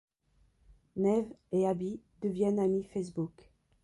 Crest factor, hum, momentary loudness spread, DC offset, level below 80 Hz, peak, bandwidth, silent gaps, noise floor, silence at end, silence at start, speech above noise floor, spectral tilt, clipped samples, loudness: 16 dB; none; 10 LU; under 0.1%; -66 dBFS; -18 dBFS; 11.5 kHz; none; -70 dBFS; 0.55 s; 0.95 s; 38 dB; -8.5 dB/octave; under 0.1%; -33 LUFS